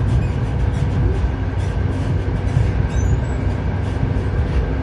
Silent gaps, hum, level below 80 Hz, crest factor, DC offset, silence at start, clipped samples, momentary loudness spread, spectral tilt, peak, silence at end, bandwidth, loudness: none; none; -22 dBFS; 14 dB; under 0.1%; 0 s; under 0.1%; 3 LU; -8 dB/octave; -4 dBFS; 0 s; 10.5 kHz; -20 LUFS